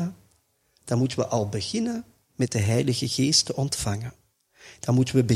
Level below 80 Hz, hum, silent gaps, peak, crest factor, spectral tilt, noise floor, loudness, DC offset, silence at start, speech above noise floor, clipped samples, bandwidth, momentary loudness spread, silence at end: -54 dBFS; none; none; -6 dBFS; 18 dB; -5 dB/octave; -67 dBFS; -25 LUFS; under 0.1%; 0 s; 43 dB; under 0.1%; 15 kHz; 14 LU; 0 s